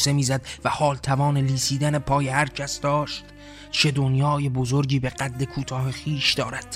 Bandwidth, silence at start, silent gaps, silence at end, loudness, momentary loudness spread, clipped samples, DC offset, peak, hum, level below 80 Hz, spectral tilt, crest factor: 14 kHz; 0 s; none; 0 s; -23 LUFS; 7 LU; under 0.1%; under 0.1%; -6 dBFS; none; -46 dBFS; -4.5 dB/octave; 18 dB